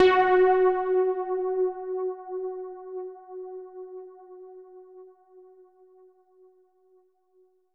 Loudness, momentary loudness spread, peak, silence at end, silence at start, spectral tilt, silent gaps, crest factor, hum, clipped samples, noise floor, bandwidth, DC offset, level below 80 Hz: -25 LUFS; 27 LU; -8 dBFS; 2.35 s; 0 s; -5.5 dB/octave; none; 20 dB; none; under 0.1%; -65 dBFS; 5.4 kHz; under 0.1%; -64 dBFS